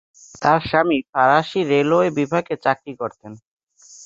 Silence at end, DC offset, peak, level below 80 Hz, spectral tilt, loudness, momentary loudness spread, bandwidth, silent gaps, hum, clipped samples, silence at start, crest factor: 0 s; under 0.1%; -2 dBFS; -56 dBFS; -6 dB/octave; -19 LUFS; 9 LU; 7.8 kHz; 1.09-1.13 s, 3.47-3.57 s, 3.63-3.67 s; none; under 0.1%; 0.4 s; 18 dB